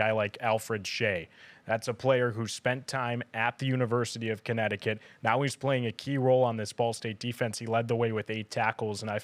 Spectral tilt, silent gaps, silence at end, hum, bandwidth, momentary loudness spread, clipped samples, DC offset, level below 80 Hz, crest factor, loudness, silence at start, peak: -5.5 dB/octave; none; 0 s; none; 15.5 kHz; 7 LU; under 0.1%; under 0.1%; -76 dBFS; 18 dB; -30 LUFS; 0 s; -12 dBFS